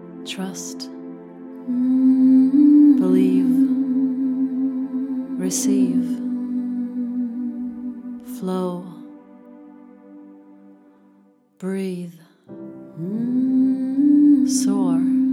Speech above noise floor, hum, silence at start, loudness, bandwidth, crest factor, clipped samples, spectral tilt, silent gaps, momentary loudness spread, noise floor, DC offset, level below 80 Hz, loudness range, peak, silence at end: 34 dB; none; 0 s; -19 LUFS; 13.5 kHz; 14 dB; under 0.1%; -6 dB/octave; none; 20 LU; -56 dBFS; under 0.1%; -72 dBFS; 18 LU; -6 dBFS; 0 s